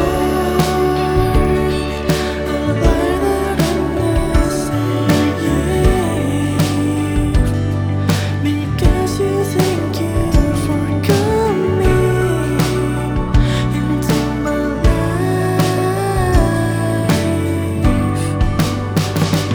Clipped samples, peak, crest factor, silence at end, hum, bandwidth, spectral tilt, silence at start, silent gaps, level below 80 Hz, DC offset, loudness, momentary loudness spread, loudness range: under 0.1%; 0 dBFS; 14 dB; 0 s; none; over 20 kHz; -6.5 dB/octave; 0 s; none; -22 dBFS; under 0.1%; -16 LUFS; 3 LU; 1 LU